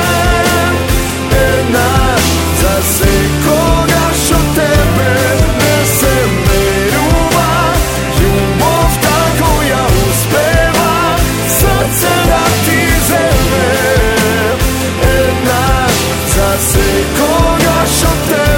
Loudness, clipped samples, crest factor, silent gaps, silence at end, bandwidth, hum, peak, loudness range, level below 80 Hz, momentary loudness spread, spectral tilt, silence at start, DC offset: -10 LUFS; under 0.1%; 10 dB; none; 0 s; 17 kHz; none; 0 dBFS; 1 LU; -18 dBFS; 2 LU; -4 dB/octave; 0 s; 0.3%